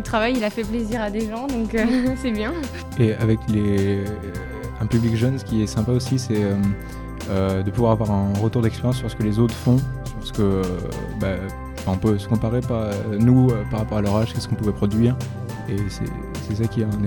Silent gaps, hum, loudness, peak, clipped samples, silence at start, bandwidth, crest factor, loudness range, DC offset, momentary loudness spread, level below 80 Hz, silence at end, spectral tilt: none; none; -22 LUFS; -4 dBFS; under 0.1%; 0 s; 18 kHz; 16 dB; 2 LU; 0.2%; 10 LU; -36 dBFS; 0 s; -7 dB/octave